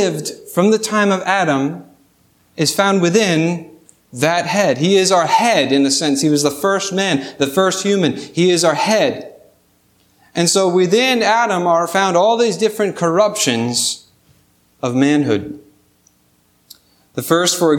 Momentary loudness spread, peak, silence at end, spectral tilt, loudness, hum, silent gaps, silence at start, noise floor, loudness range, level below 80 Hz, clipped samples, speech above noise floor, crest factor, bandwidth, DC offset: 8 LU; 0 dBFS; 0 s; -4 dB/octave; -15 LUFS; 60 Hz at -45 dBFS; none; 0 s; -57 dBFS; 4 LU; -64 dBFS; under 0.1%; 42 dB; 16 dB; 19 kHz; under 0.1%